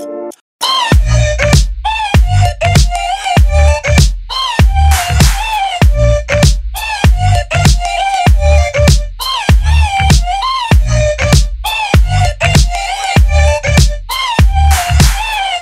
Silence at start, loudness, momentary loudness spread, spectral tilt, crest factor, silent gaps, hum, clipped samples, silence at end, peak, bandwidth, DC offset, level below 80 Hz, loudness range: 0 s; -11 LUFS; 5 LU; -4.5 dB/octave; 10 dB; 0.41-0.59 s; none; under 0.1%; 0 s; 0 dBFS; 16 kHz; under 0.1%; -12 dBFS; 1 LU